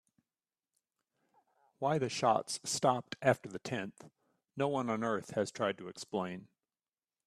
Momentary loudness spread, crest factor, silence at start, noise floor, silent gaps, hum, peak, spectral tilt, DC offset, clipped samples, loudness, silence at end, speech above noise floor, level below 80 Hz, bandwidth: 10 LU; 24 dB; 1.8 s; under -90 dBFS; none; none; -12 dBFS; -4.5 dB/octave; under 0.1%; under 0.1%; -35 LUFS; 0.8 s; over 55 dB; -76 dBFS; 14 kHz